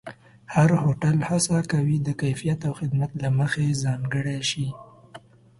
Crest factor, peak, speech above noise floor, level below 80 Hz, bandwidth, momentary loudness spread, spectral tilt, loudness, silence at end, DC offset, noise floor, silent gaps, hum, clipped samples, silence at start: 18 dB; -6 dBFS; 25 dB; -54 dBFS; 11.5 kHz; 7 LU; -5.5 dB/octave; -24 LUFS; 0.4 s; under 0.1%; -48 dBFS; none; none; under 0.1%; 0.05 s